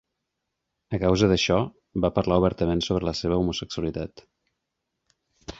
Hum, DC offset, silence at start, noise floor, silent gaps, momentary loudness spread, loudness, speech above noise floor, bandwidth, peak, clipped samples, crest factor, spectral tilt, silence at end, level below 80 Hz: none; under 0.1%; 0.9 s; -81 dBFS; none; 12 LU; -24 LUFS; 58 dB; 7.8 kHz; -6 dBFS; under 0.1%; 20 dB; -6 dB/octave; 0.05 s; -42 dBFS